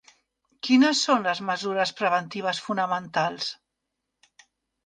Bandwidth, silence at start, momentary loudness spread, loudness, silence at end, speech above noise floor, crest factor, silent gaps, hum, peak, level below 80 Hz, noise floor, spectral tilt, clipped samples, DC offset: 9.6 kHz; 0.65 s; 12 LU; -24 LUFS; 1.3 s; 58 dB; 18 dB; none; none; -8 dBFS; -74 dBFS; -82 dBFS; -3.5 dB/octave; under 0.1%; under 0.1%